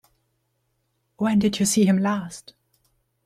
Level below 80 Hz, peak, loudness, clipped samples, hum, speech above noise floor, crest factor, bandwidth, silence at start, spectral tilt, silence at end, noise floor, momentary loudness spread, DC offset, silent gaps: -60 dBFS; -10 dBFS; -21 LUFS; under 0.1%; none; 51 dB; 16 dB; 13.5 kHz; 1.2 s; -5 dB/octave; 0.85 s; -72 dBFS; 15 LU; under 0.1%; none